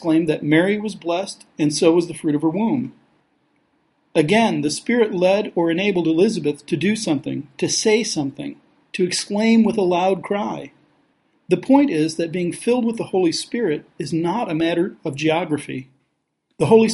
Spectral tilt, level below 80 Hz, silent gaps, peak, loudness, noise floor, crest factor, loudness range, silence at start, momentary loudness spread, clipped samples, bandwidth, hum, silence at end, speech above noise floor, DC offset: -5 dB/octave; -62 dBFS; none; -2 dBFS; -20 LUFS; -71 dBFS; 18 dB; 3 LU; 0 s; 9 LU; under 0.1%; 11.5 kHz; none; 0 s; 52 dB; under 0.1%